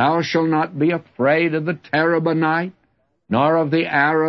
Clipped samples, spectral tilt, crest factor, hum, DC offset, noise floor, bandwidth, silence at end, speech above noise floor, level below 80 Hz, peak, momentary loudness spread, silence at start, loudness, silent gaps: under 0.1%; -7 dB/octave; 14 dB; none; under 0.1%; -65 dBFS; 6.2 kHz; 0 s; 47 dB; -64 dBFS; -4 dBFS; 6 LU; 0 s; -19 LUFS; none